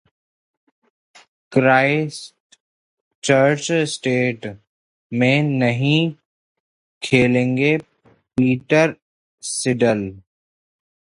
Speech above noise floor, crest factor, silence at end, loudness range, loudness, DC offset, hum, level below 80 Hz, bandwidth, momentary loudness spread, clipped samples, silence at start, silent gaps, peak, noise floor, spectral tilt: over 72 dB; 20 dB; 0.95 s; 3 LU; -18 LUFS; under 0.1%; none; -58 dBFS; 11.5 kHz; 13 LU; under 0.1%; 1.5 s; 2.40-2.50 s, 2.60-3.22 s, 4.67-5.10 s, 6.25-7.01 s, 9.02-9.38 s; 0 dBFS; under -90 dBFS; -5.5 dB/octave